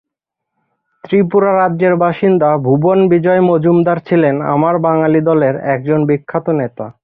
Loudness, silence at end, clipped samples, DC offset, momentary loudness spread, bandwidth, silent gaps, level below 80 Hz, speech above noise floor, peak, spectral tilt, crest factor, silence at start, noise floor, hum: -13 LUFS; 0.1 s; under 0.1%; under 0.1%; 6 LU; 4.6 kHz; none; -54 dBFS; 67 dB; -2 dBFS; -12 dB/octave; 12 dB; 1.05 s; -79 dBFS; none